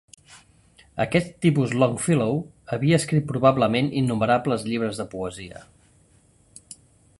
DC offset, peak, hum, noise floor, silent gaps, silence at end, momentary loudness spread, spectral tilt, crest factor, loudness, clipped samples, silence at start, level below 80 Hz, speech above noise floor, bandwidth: under 0.1%; -4 dBFS; none; -58 dBFS; none; 1.55 s; 13 LU; -6 dB/octave; 20 dB; -23 LUFS; under 0.1%; 0.3 s; -54 dBFS; 36 dB; 11.5 kHz